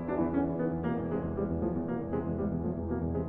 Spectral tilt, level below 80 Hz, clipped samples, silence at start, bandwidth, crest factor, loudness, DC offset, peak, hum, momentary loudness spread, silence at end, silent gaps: -12.5 dB/octave; -46 dBFS; under 0.1%; 0 s; 3.6 kHz; 14 dB; -33 LUFS; under 0.1%; -18 dBFS; none; 3 LU; 0 s; none